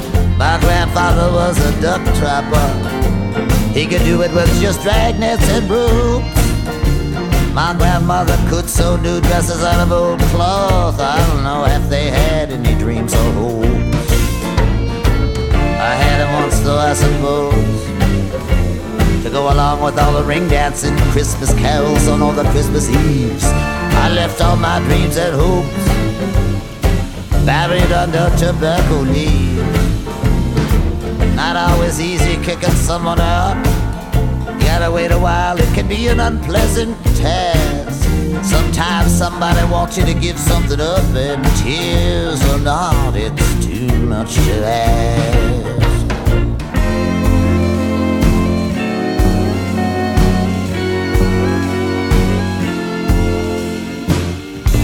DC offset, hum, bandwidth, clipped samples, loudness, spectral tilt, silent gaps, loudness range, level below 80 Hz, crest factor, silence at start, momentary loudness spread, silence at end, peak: under 0.1%; none; 17.5 kHz; under 0.1%; -15 LUFS; -5.5 dB/octave; none; 2 LU; -18 dBFS; 14 dB; 0 s; 4 LU; 0 s; 0 dBFS